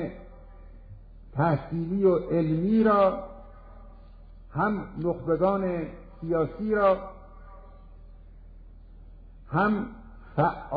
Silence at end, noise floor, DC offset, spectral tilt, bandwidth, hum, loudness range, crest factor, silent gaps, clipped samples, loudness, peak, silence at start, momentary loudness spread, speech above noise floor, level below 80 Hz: 0 s; -47 dBFS; under 0.1%; -11.5 dB/octave; 5 kHz; none; 6 LU; 18 dB; none; under 0.1%; -26 LUFS; -10 dBFS; 0 s; 16 LU; 22 dB; -48 dBFS